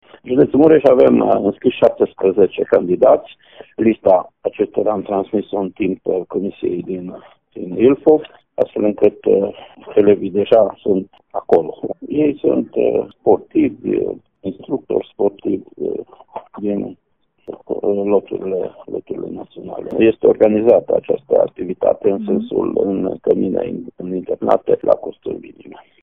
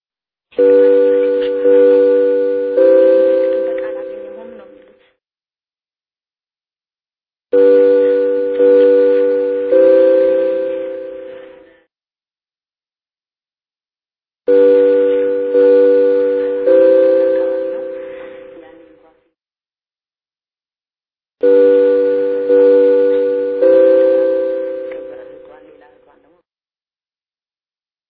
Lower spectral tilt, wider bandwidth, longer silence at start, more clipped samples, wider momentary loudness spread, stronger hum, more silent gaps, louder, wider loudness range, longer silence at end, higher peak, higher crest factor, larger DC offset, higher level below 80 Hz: second, -7 dB/octave vs -9 dB/octave; about the same, 4.2 kHz vs 4.5 kHz; second, 0.25 s vs 0.6 s; neither; about the same, 15 LU vs 17 LU; neither; neither; second, -17 LUFS vs -12 LUFS; second, 7 LU vs 13 LU; second, 0.3 s vs 2.75 s; about the same, 0 dBFS vs 0 dBFS; about the same, 16 dB vs 14 dB; first, 0.1% vs under 0.1%; about the same, -56 dBFS vs -60 dBFS